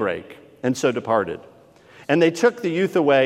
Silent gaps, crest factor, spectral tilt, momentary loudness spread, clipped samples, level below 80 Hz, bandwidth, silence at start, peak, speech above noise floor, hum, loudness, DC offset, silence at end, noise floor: none; 18 dB; -5.5 dB/octave; 14 LU; under 0.1%; -68 dBFS; 14.5 kHz; 0 s; -4 dBFS; 29 dB; none; -21 LUFS; under 0.1%; 0 s; -48 dBFS